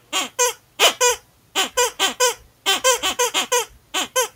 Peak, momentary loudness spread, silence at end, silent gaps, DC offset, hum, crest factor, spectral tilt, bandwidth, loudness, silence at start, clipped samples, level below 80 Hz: 0 dBFS; 8 LU; 0.05 s; none; under 0.1%; none; 22 dB; 1.5 dB/octave; 18 kHz; -19 LUFS; 0.1 s; under 0.1%; -58 dBFS